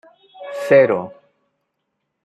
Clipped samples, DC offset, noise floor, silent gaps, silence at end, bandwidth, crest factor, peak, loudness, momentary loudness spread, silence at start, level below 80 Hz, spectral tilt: under 0.1%; under 0.1%; -75 dBFS; none; 1.15 s; 12.5 kHz; 18 dB; -2 dBFS; -16 LUFS; 23 LU; 0.4 s; -70 dBFS; -6.5 dB/octave